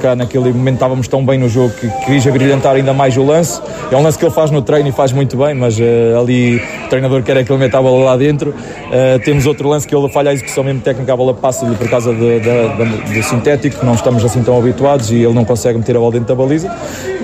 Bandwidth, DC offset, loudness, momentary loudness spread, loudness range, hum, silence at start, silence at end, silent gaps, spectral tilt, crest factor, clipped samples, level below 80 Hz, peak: 15.5 kHz; under 0.1%; -12 LUFS; 5 LU; 2 LU; none; 0 s; 0 s; none; -6.5 dB/octave; 10 dB; under 0.1%; -40 dBFS; 0 dBFS